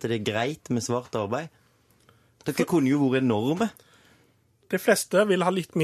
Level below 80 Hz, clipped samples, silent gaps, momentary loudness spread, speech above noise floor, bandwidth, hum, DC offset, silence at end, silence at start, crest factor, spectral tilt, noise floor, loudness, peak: -66 dBFS; under 0.1%; none; 10 LU; 39 dB; 14 kHz; none; under 0.1%; 0 s; 0 s; 20 dB; -5.5 dB/octave; -63 dBFS; -25 LUFS; -6 dBFS